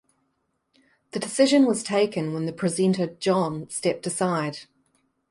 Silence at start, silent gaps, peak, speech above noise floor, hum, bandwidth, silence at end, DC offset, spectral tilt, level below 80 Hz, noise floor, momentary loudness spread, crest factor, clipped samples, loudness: 1.15 s; none; -6 dBFS; 51 dB; none; 11.5 kHz; 0.7 s; under 0.1%; -5 dB/octave; -68 dBFS; -74 dBFS; 11 LU; 18 dB; under 0.1%; -24 LUFS